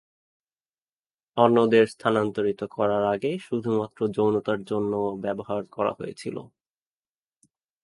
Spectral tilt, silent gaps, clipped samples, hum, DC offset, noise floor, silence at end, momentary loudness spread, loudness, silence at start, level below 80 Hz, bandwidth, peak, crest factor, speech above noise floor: -7 dB/octave; none; under 0.1%; none; under 0.1%; under -90 dBFS; 1.4 s; 13 LU; -25 LUFS; 1.35 s; -64 dBFS; 11.5 kHz; -2 dBFS; 24 dB; over 66 dB